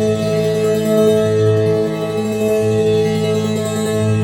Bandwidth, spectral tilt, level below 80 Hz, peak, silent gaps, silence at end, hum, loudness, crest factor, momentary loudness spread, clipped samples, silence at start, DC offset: 17 kHz; -6.5 dB/octave; -50 dBFS; -2 dBFS; none; 0 s; none; -16 LUFS; 12 dB; 5 LU; under 0.1%; 0 s; under 0.1%